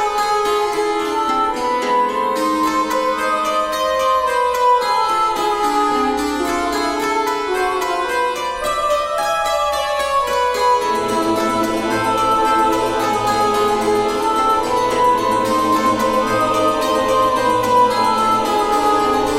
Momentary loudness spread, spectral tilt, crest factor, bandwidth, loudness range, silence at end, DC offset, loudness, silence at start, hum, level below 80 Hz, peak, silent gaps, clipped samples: 4 LU; -3.5 dB/octave; 12 dB; 16 kHz; 3 LU; 0 s; under 0.1%; -17 LUFS; 0 s; none; -44 dBFS; -4 dBFS; none; under 0.1%